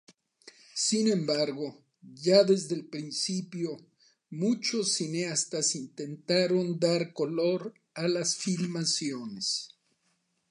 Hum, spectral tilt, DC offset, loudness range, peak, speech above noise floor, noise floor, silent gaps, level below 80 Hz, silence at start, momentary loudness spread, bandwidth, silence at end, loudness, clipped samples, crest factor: none; -4 dB/octave; under 0.1%; 3 LU; -8 dBFS; 46 dB; -75 dBFS; none; -80 dBFS; 0.45 s; 12 LU; 11.5 kHz; 0.85 s; -29 LUFS; under 0.1%; 22 dB